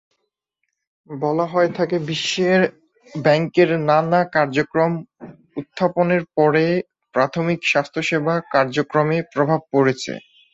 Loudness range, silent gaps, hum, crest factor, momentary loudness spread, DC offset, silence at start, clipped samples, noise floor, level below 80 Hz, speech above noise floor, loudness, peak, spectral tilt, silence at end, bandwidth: 2 LU; none; none; 18 dB; 9 LU; under 0.1%; 1.1 s; under 0.1%; -76 dBFS; -62 dBFS; 58 dB; -19 LUFS; -2 dBFS; -6 dB/octave; 0.35 s; 8 kHz